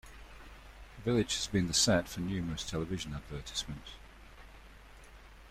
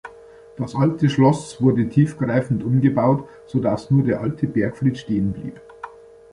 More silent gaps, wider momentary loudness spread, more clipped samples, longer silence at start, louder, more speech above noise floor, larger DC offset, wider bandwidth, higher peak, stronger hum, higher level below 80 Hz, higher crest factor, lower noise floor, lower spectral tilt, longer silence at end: neither; first, 26 LU vs 14 LU; neither; about the same, 0.05 s vs 0.05 s; second, -33 LUFS vs -20 LUFS; second, 20 dB vs 25 dB; neither; first, 16 kHz vs 11 kHz; second, -16 dBFS vs -2 dBFS; neither; about the same, -52 dBFS vs -50 dBFS; about the same, 20 dB vs 18 dB; first, -54 dBFS vs -44 dBFS; second, -3.5 dB/octave vs -8 dB/octave; second, 0 s vs 0.45 s